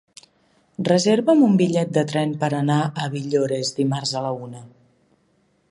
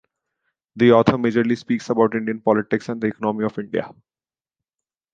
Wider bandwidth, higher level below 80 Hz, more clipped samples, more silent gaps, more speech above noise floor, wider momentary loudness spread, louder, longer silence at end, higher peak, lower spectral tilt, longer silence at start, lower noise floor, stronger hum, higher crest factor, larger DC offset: first, 11.5 kHz vs 7.6 kHz; second, -66 dBFS vs -56 dBFS; neither; neither; second, 44 dB vs over 71 dB; about the same, 13 LU vs 11 LU; about the same, -20 LUFS vs -20 LUFS; second, 1.05 s vs 1.2 s; about the same, -4 dBFS vs -2 dBFS; second, -6 dB/octave vs -7.5 dB/octave; about the same, 0.8 s vs 0.75 s; second, -64 dBFS vs under -90 dBFS; neither; about the same, 18 dB vs 20 dB; neither